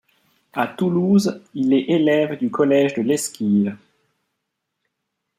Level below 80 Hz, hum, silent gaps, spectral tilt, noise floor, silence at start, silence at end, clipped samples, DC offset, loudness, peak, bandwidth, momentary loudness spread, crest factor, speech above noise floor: -66 dBFS; none; none; -6 dB/octave; -78 dBFS; 0.55 s; 1.65 s; under 0.1%; under 0.1%; -19 LUFS; -4 dBFS; 15 kHz; 8 LU; 16 dB; 59 dB